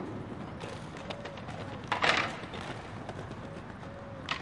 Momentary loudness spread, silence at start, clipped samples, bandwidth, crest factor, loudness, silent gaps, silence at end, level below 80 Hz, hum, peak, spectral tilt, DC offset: 16 LU; 0 s; under 0.1%; 11.5 kHz; 32 dB; -36 LUFS; none; 0 s; -58 dBFS; none; -6 dBFS; -4 dB/octave; under 0.1%